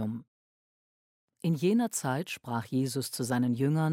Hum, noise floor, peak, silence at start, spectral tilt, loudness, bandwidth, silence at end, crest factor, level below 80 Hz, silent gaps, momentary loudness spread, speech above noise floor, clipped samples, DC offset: none; under -90 dBFS; -16 dBFS; 0 s; -6 dB/octave; -30 LUFS; 16.5 kHz; 0 s; 16 dB; -74 dBFS; 0.28-1.28 s; 8 LU; over 61 dB; under 0.1%; under 0.1%